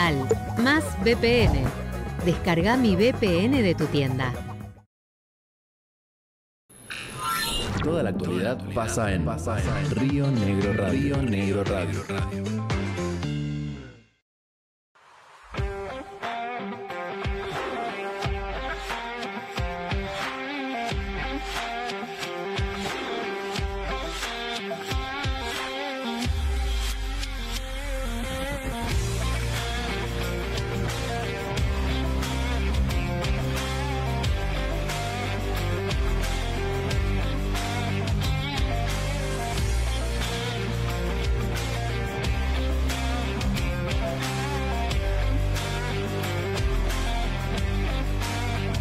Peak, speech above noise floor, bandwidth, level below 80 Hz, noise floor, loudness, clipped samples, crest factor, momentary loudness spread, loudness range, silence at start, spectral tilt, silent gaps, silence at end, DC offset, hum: -12 dBFS; 28 dB; 15.5 kHz; -32 dBFS; -52 dBFS; -27 LUFS; under 0.1%; 14 dB; 8 LU; 7 LU; 0 s; -5.5 dB/octave; 4.86-6.69 s, 14.22-14.95 s; 0 s; under 0.1%; none